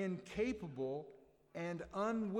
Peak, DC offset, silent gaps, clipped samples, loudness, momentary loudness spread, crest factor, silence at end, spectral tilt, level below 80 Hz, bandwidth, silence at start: -28 dBFS; under 0.1%; none; under 0.1%; -42 LUFS; 10 LU; 14 dB; 0 s; -7 dB/octave; -66 dBFS; 11.5 kHz; 0 s